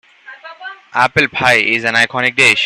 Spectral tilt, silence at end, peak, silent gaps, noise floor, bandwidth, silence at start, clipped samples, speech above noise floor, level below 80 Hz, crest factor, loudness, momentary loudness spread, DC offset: -3 dB/octave; 0 s; 0 dBFS; none; -36 dBFS; 15.5 kHz; 0.3 s; under 0.1%; 23 dB; -52 dBFS; 14 dB; -12 LUFS; 20 LU; under 0.1%